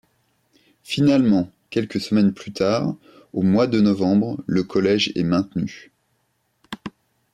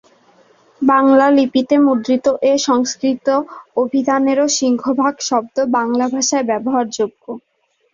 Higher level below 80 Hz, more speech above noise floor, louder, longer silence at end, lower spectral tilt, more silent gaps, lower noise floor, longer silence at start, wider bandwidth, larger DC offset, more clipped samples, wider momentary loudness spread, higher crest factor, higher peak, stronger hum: about the same, -58 dBFS vs -60 dBFS; first, 49 dB vs 36 dB; second, -20 LUFS vs -15 LUFS; about the same, 0.45 s vs 0.55 s; first, -6.5 dB/octave vs -3 dB/octave; neither; first, -69 dBFS vs -51 dBFS; about the same, 0.9 s vs 0.8 s; first, 11.5 kHz vs 7.6 kHz; neither; neither; first, 16 LU vs 9 LU; about the same, 14 dB vs 14 dB; second, -8 dBFS vs -2 dBFS; neither